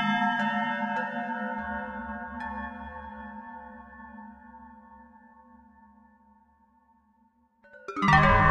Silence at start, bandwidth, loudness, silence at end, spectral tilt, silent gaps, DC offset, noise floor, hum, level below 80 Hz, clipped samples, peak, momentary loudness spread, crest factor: 0 s; 9.2 kHz; -27 LUFS; 0 s; -6.5 dB/octave; none; under 0.1%; -66 dBFS; none; -44 dBFS; under 0.1%; -6 dBFS; 25 LU; 24 dB